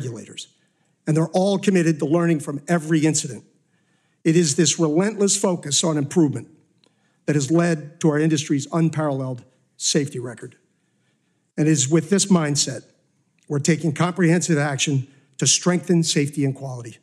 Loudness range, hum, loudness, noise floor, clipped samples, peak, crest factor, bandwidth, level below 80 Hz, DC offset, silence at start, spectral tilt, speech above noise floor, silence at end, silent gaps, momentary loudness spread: 3 LU; none; -20 LUFS; -67 dBFS; under 0.1%; -6 dBFS; 16 dB; 13 kHz; -72 dBFS; under 0.1%; 0 s; -4.5 dB/octave; 47 dB; 0.1 s; none; 14 LU